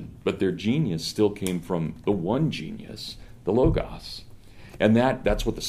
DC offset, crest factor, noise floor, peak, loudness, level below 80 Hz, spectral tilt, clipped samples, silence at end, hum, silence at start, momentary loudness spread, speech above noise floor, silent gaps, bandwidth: under 0.1%; 18 dB; -44 dBFS; -6 dBFS; -25 LUFS; -40 dBFS; -6 dB/octave; under 0.1%; 0 s; none; 0 s; 15 LU; 20 dB; none; 15.5 kHz